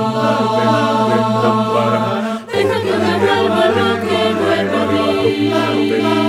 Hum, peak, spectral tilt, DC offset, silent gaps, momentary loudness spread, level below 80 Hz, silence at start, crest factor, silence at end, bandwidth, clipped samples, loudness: none; 0 dBFS; -6 dB/octave; under 0.1%; none; 2 LU; -60 dBFS; 0 s; 14 dB; 0 s; 15.5 kHz; under 0.1%; -15 LUFS